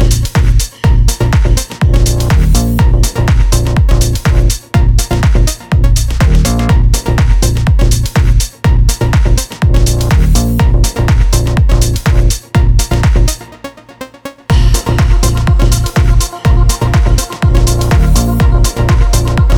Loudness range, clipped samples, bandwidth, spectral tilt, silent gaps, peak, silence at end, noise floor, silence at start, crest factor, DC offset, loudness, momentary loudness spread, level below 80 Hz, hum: 2 LU; 0.2%; 17 kHz; -5.5 dB/octave; none; 0 dBFS; 0 s; -31 dBFS; 0 s; 8 dB; under 0.1%; -11 LUFS; 2 LU; -10 dBFS; none